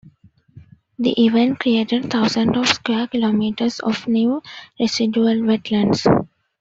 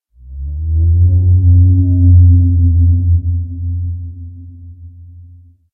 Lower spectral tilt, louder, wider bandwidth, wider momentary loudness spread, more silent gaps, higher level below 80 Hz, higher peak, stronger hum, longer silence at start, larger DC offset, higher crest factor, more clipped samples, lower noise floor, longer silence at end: second, -5 dB/octave vs -17.5 dB/octave; second, -18 LUFS vs -12 LUFS; first, 7.8 kHz vs 0.7 kHz; second, 6 LU vs 18 LU; neither; second, -56 dBFS vs -20 dBFS; about the same, -2 dBFS vs 0 dBFS; neither; second, 0.05 s vs 0.25 s; neither; about the same, 16 dB vs 12 dB; neither; first, -51 dBFS vs -40 dBFS; second, 0.35 s vs 0.5 s